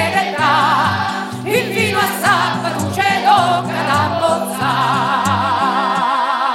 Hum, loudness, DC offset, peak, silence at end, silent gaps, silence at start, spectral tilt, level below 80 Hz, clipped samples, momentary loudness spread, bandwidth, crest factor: none; -15 LUFS; under 0.1%; 0 dBFS; 0 s; none; 0 s; -4 dB/octave; -58 dBFS; under 0.1%; 5 LU; 16 kHz; 16 dB